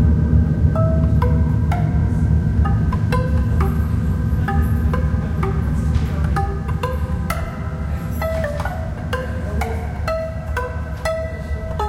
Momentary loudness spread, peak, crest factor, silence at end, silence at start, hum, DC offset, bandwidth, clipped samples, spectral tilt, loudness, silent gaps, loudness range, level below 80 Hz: 8 LU; -2 dBFS; 16 dB; 0 s; 0 s; none; under 0.1%; 13.5 kHz; under 0.1%; -8 dB/octave; -20 LUFS; none; 6 LU; -22 dBFS